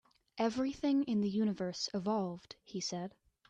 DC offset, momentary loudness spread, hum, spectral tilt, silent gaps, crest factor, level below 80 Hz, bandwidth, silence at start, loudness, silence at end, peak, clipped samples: under 0.1%; 13 LU; none; -5.5 dB/octave; none; 16 dB; -72 dBFS; 8.8 kHz; 0.35 s; -36 LUFS; 0.4 s; -20 dBFS; under 0.1%